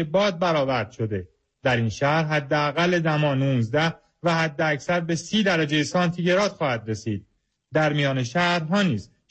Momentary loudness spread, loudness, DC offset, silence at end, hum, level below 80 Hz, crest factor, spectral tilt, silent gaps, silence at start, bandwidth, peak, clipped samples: 7 LU; -23 LUFS; under 0.1%; 0.25 s; none; -58 dBFS; 14 dB; -5.5 dB/octave; none; 0 s; 8.6 kHz; -8 dBFS; under 0.1%